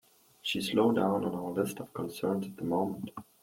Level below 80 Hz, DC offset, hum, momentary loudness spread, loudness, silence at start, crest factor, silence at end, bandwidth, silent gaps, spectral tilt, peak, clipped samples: -70 dBFS; under 0.1%; none; 12 LU; -32 LUFS; 0.45 s; 18 dB; 0.2 s; 16.5 kHz; none; -5.5 dB/octave; -14 dBFS; under 0.1%